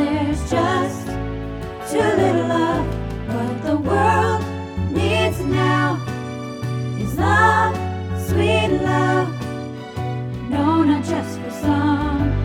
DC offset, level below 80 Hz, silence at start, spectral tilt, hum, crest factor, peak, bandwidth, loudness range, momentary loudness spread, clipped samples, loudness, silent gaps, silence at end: under 0.1%; -36 dBFS; 0 s; -6.5 dB/octave; none; 16 dB; -2 dBFS; 16.5 kHz; 2 LU; 11 LU; under 0.1%; -20 LUFS; none; 0 s